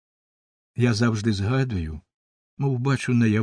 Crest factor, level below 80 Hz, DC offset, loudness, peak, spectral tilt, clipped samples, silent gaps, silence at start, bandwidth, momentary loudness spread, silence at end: 18 dB; -46 dBFS; under 0.1%; -24 LUFS; -6 dBFS; -6.5 dB/octave; under 0.1%; 2.14-2.57 s; 0.75 s; 10 kHz; 13 LU; 0 s